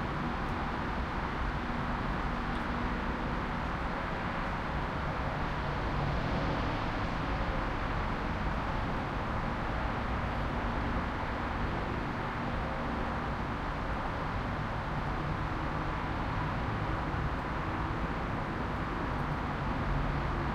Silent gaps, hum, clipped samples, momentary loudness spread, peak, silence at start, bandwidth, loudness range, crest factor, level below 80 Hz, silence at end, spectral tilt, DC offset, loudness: none; none; under 0.1%; 2 LU; -20 dBFS; 0 s; 10.5 kHz; 1 LU; 14 dB; -40 dBFS; 0 s; -7 dB/octave; under 0.1%; -34 LUFS